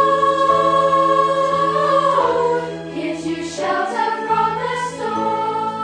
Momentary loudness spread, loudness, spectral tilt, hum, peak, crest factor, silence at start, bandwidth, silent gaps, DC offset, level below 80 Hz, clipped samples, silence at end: 9 LU; -18 LUFS; -5 dB/octave; none; -4 dBFS; 14 dB; 0 s; 10 kHz; none; under 0.1%; -54 dBFS; under 0.1%; 0 s